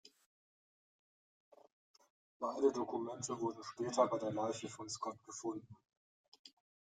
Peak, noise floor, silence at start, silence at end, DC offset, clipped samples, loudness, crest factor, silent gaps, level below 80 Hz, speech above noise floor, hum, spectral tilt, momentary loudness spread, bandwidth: -20 dBFS; under -90 dBFS; 2.4 s; 0.4 s; under 0.1%; under 0.1%; -40 LUFS; 22 dB; 5.97-6.32 s, 6.39-6.44 s; -84 dBFS; over 51 dB; none; -4.5 dB/octave; 10 LU; 9.6 kHz